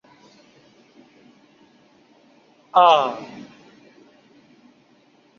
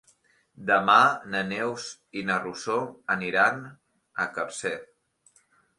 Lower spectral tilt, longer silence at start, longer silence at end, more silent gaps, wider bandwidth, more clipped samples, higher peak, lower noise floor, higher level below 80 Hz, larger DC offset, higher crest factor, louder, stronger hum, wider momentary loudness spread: about the same, -3.5 dB/octave vs -3.5 dB/octave; first, 2.75 s vs 0.6 s; first, 1.95 s vs 0.95 s; neither; second, 7 kHz vs 11.5 kHz; neither; first, -2 dBFS vs -6 dBFS; second, -57 dBFS vs -64 dBFS; second, -76 dBFS vs -70 dBFS; neither; about the same, 24 dB vs 22 dB; first, -17 LUFS vs -25 LUFS; neither; first, 28 LU vs 18 LU